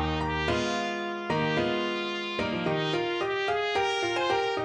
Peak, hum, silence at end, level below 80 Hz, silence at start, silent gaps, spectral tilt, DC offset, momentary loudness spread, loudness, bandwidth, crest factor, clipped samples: -14 dBFS; none; 0 s; -48 dBFS; 0 s; none; -5 dB/octave; under 0.1%; 4 LU; -28 LUFS; 10 kHz; 14 dB; under 0.1%